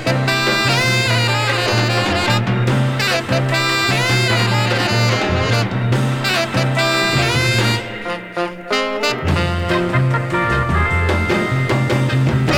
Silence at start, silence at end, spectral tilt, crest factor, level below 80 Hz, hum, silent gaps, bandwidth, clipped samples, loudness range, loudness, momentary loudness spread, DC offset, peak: 0 s; 0 s; -5 dB/octave; 14 dB; -34 dBFS; none; none; 17.5 kHz; under 0.1%; 2 LU; -16 LUFS; 4 LU; under 0.1%; -2 dBFS